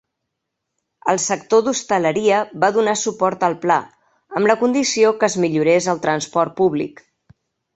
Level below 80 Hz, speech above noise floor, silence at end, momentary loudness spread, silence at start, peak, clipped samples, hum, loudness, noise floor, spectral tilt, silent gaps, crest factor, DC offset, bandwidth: -64 dBFS; 61 dB; 0.85 s; 5 LU; 1.05 s; -2 dBFS; under 0.1%; none; -18 LUFS; -78 dBFS; -4 dB/octave; none; 18 dB; under 0.1%; 8.4 kHz